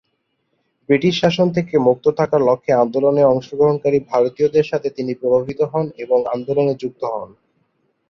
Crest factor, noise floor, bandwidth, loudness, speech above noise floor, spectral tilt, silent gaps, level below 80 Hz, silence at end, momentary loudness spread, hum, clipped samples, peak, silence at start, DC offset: 16 dB; -70 dBFS; 6.8 kHz; -17 LUFS; 53 dB; -7 dB/octave; none; -58 dBFS; 0.85 s; 8 LU; none; under 0.1%; -2 dBFS; 0.9 s; under 0.1%